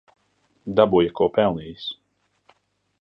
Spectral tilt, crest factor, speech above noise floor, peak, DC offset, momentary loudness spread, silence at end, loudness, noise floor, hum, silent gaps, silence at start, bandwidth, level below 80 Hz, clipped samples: -8.5 dB/octave; 20 dB; 46 dB; -4 dBFS; under 0.1%; 17 LU; 1.05 s; -21 LUFS; -67 dBFS; none; none; 0.65 s; 5.8 kHz; -54 dBFS; under 0.1%